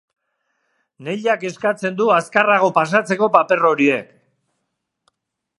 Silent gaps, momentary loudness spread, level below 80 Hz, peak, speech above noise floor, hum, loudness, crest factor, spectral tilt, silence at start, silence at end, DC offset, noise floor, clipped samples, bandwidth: none; 8 LU; -70 dBFS; 0 dBFS; 59 dB; none; -17 LUFS; 18 dB; -5.5 dB/octave; 1 s; 1.55 s; under 0.1%; -76 dBFS; under 0.1%; 11.5 kHz